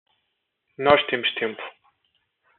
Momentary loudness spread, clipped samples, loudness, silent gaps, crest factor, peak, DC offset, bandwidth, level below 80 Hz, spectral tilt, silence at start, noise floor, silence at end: 18 LU; under 0.1%; -22 LUFS; none; 22 dB; -4 dBFS; under 0.1%; 4.4 kHz; -62 dBFS; -1 dB/octave; 0.8 s; -76 dBFS; 0.9 s